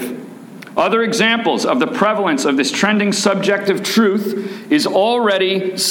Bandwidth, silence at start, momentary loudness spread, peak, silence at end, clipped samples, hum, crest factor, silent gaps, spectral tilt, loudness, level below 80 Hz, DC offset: 18 kHz; 0 s; 9 LU; -2 dBFS; 0 s; under 0.1%; none; 14 dB; none; -3.5 dB/octave; -15 LUFS; -64 dBFS; under 0.1%